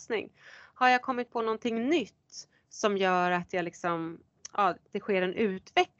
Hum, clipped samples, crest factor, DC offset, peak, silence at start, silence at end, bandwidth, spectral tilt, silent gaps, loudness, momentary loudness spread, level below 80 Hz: none; under 0.1%; 22 dB; under 0.1%; -8 dBFS; 0 s; 0.15 s; 8 kHz; -4.5 dB/octave; none; -29 LUFS; 19 LU; -74 dBFS